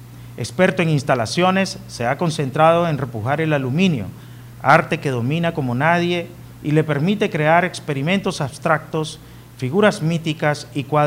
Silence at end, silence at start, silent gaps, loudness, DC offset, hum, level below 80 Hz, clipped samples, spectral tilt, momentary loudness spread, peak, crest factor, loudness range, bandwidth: 0 s; 0 s; none; -19 LUFS; under 0.1%; none; -52 dBFS; under 0.1%; -6 dB/octave; 12 LU; 0 dBFS; 18 dB; 2 LU; 16 kHz